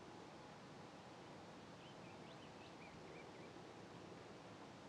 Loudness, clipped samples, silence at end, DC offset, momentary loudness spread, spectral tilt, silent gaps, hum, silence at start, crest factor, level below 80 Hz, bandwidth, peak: -58 LUFS; under 0.1%; 0 s; under 0.1%; 1 LU; -5 dB/octave; none; none; 0 s; 14 dB; -82 dBFS; 11.5 kHz; -44 dBFS